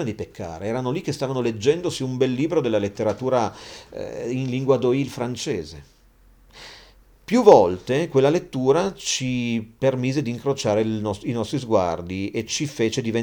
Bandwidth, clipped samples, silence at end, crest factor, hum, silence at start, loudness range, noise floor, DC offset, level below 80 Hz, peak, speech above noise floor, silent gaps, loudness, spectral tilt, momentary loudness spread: 19.5 kHz; under 0.1%; 0 s; 22 dB; none; 0 s; 6 LU; -54 dBFS; under 0.1%; -54 dBFS; 0 dBFS; 32 dB; none; -22 LUFS; -5.5 dB/octave; 11 LU